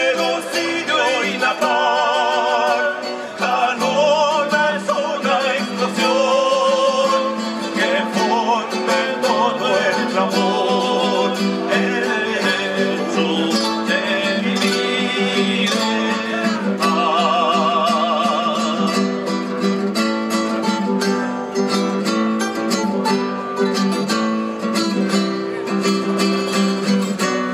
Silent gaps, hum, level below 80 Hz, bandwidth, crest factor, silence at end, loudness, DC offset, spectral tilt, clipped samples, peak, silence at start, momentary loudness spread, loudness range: none; none; -70 dBFS; 15.5 kHz; 14 dB; 0 s; -18 LUFS; under 0.1%; -4 dB/octave; under 0.1%; -4 dBFS; 0 s; 4 LU; 2 LU